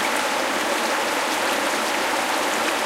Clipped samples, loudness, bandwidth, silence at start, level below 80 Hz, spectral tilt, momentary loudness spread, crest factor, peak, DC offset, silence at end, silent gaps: under 0.1%; -21 LUFS; 16.5 kHz; 0 s; -64 dBFS; -1 dB/octave; 1 LU; 12 dB; -10 dBFS; under 0.1%; 0 s; none